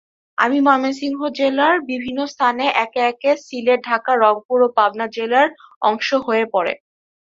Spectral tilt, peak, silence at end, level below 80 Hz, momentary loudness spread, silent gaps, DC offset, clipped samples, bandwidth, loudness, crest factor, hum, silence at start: -4 dB/octave; -2 dBFS; 0.6 s; -66 dBFS; 8 LU; 4.45-4.49 s, 5.76-5.81 s; under 0.1%; under 0.1%; 7.6 kHz; -18 LUFS; 16 dB; none; 0.4 s